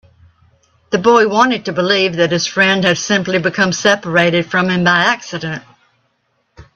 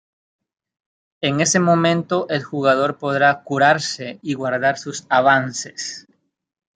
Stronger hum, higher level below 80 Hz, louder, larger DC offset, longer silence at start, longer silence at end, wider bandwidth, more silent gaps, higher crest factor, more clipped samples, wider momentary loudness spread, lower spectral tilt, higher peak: neither; first, -54 dBFS vs -66 dBFS; first, -13 LUFS vs -18 LUFS; neither; second, 0.9 s vs 1.2 s; second, 0.15 s vs 0.75 s; second, 8.4 kHz vs 9.4 kHz; neither; about the same, 16 dB vs 18 dB; neither; second, 9 LU vs 13 LU; about the same, -4 dB/octave vs -4 dB/octave; about the same, 0 dBFS vs -2 dBFS